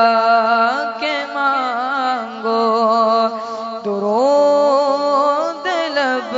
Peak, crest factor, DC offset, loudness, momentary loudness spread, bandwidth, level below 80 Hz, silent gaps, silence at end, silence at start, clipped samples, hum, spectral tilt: -2 dBFS; 14 dB; under 0.1%; -16 LUFS; 7 LU; 7.8 kHz; -72 dBFS; none; 0 s; 0 s; under 0.1%; none; -4 dB/octave